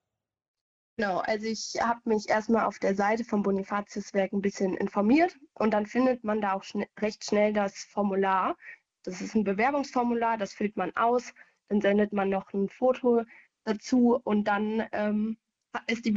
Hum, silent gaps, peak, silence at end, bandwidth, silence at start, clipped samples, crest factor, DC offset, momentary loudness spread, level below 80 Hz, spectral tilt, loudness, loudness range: none; none; -12 dBFS; 0 s; 7.8 kHz; 1 s; under 0.1%; 16 dB; under 0.1%; 9 LU; -64 dBFS; -5.5 dB/octave; -28 LUFS; 2 LU